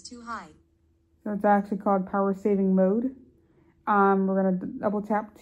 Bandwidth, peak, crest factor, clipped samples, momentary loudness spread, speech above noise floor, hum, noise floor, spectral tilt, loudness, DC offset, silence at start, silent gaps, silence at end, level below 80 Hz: 8.6 kHz; -10 dBFS; 16 dB; under 0.1%; 15 LU; 41 dB; none; -66 dBFS; -8.5 dB/octave; -25 LUFS; under 0.1%; 0.05 s; none; 0.15 s; -64 dBFS